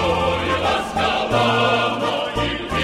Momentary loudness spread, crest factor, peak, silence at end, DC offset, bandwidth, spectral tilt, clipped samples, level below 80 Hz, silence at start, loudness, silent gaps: 5 LU; 14 dB; -6 dBFS; 0 s; under 0.1%; 15.5 kHz; -5 dB/octave; under 0.1%; -38 dBFS; 0 s; -19 LUFS; none